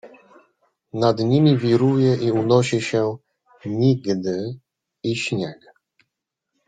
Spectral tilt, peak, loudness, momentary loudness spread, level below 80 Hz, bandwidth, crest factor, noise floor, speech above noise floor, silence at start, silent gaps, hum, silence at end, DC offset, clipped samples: -7 dB/octave; -4 dBFS; -20 LUFS; 15 LU; -60 dBFS; 9.2 kHz; 18 dB; -81 dBFS; 62 dB; 0.05 s; none; none; 1.15 s; under 0.1%; under 0.1%